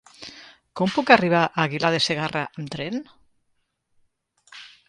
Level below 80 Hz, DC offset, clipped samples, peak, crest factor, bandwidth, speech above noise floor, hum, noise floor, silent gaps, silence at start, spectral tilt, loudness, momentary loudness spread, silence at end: -64 dBFS; under 0.1%; under 0.1%; -2 dBFS; 24 dB; 11.5 kHz; 50 dB; none; -72 dBFS; none; 0.2 s; -5 dB/octave; -21 LUFS; 24 LU; 0.2 s